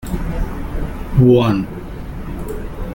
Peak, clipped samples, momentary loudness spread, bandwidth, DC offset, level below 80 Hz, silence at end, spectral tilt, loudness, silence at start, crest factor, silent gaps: -2 dBFS; under 0.1%; 18 LU; 17 kHz; under 0.1%; -26 dBFS; 0 s; -8.5 dB/octave; -18 LUFS; 0 s; 16 dB; none